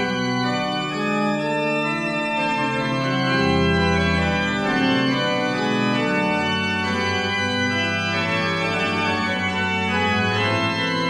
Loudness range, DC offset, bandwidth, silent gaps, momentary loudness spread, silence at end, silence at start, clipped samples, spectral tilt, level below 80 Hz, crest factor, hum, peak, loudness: 1 LU; under 0.1%; 12.5 kHz; none; 3 LU; 0 s; 0 s; under 0.1%; -5 dB/octave; -44 dBFS; 14 dB; none; -6 dBFS; -21 LUFS